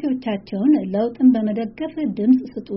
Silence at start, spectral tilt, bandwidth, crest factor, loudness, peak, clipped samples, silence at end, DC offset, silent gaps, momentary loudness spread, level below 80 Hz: 0 s; -7.5 dB/octave; 5.6 kHz; 14 dB; -20 LUFS; -6 dBFS; under 0.1%; 0 s; under 0.1%; none; 9 LU; -56 dBFS